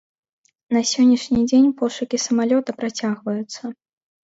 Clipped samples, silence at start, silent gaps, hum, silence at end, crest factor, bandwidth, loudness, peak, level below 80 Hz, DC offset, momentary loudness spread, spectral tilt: under 0.1%; 0.7 s; none; none; 0.5 s; 14 dB; 8 kHz; -19 LUFS; -6 dBFS; -56 dBFS; under 0.1%; 11 LU; -4 dB/octave